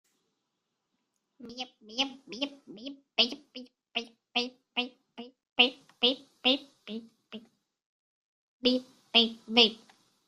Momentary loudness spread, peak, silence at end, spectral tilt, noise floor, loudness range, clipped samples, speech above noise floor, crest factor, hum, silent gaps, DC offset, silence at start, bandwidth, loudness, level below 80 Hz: 23 LU; -6 dBFS; 0.5 s; -2.5 dB/octave; -83 dBFS; 6 LU; under 0.1%; 48 dB; 28 dB; none; 5.52-5.56 s, 7.86-8.60 s; under 0.1%; 1.4 s; 11.5 kHz; -28 LUFS; -76 dBFS